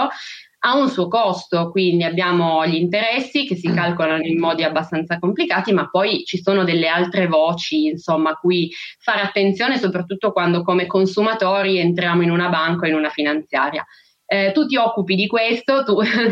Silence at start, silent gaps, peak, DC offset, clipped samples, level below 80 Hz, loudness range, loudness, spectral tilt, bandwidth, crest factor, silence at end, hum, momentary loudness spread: 0 s; none; -4 dBFS; under 0.1%; under 0.1%; -66 dBFS; 1 LU; -18 LUFS; -6.5 dB/octave; 7.6 kHz; 14 dB; 0 s; none; 4 LU